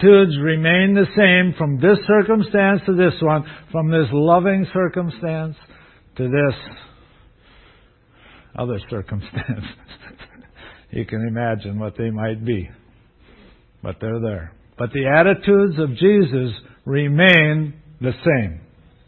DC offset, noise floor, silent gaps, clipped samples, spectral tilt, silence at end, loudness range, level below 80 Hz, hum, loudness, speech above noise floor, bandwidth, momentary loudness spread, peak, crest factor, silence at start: under 0.1%; -52 dBFS; none; under 0.1%; -9.5 dB/octave; 0.5 s; 14 LU; -46 dBFS; none; -18 LUFS; 35 dB; 4.4 kHz; 16 LU; 0 dBFS; 18 dB; 0 s